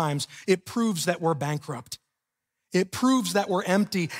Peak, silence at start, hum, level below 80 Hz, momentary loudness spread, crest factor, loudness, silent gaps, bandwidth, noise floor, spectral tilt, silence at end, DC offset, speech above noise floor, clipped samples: -10 dBFS; 0 s; none; -68 dBFS; 12 LU; 18 dB; -26 LUFS; none; 16 kHz; -84 dBFS; -5 dB/octave; 0 s; under 0.1%; 58 dB; under 0.1%